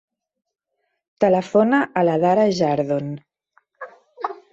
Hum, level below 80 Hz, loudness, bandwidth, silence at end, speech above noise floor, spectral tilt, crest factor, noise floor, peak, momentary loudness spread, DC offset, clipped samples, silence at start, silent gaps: none; -64 dBFS; -19 LUFS; 8 kHz; 0.2 s; 57 dB; -7 dB/octave; 18 dB; -75 dBFS; -4 dBFS; 23 LU; under 0.1%; under 0.1%; 1.2 s; none